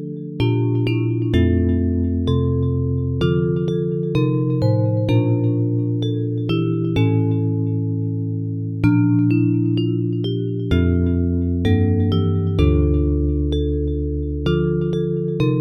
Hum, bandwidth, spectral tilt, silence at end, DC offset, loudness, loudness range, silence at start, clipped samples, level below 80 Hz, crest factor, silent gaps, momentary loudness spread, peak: none; 6.2 kHz; -9.5 dB/octave; 0 s; under 0.1%; -19 LUFS; 1 LU; 0 s; under 0.1%; -30 dBFS; 16 dB; none; 5 LU; -4 dBFS